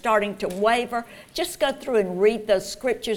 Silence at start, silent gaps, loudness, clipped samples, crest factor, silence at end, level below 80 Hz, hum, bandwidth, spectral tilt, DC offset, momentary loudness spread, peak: 0.05 s; none; -24 LUFS; under 0.1%; 16 dB; 0 s; -52 dBFS; none; 18 kHz; -4 dB/octave; under 0.1%; 9 LU; -8 dBFS